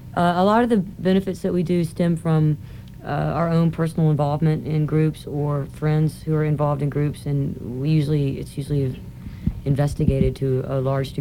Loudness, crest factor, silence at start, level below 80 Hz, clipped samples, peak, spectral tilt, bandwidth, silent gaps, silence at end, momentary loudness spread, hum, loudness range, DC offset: -22 LUFS; 16 dB; 0 s; -40 dBFS; under 0.1%; -4 dBFS; -8.5 dB/octave; 13.5 kHz; none; 0 s; 8 LU; none; 2 LU; 0.1%